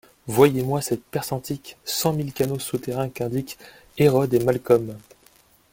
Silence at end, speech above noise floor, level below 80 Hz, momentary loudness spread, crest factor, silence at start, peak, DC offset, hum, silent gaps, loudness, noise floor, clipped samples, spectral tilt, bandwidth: 0.75 s; 34 dB; -56 dBFS; 15 LU; 22 dB; 0.25 s; -2 dBFS; under 0.1%; none; none; -23 LUFS; -57 dBFS; under 0.1%; -5.5 dB/octave; 17 kHz